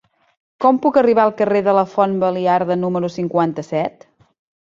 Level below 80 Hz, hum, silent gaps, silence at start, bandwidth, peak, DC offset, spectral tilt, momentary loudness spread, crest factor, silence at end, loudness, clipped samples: -62 dBFS; none; none; 0.6 s; 7.6 kHz; -2 dBFS; under 0.1%; -8 dB/octave; 8 LU; 16 dB; 0.75 s; -17 LUFS; under 0.1%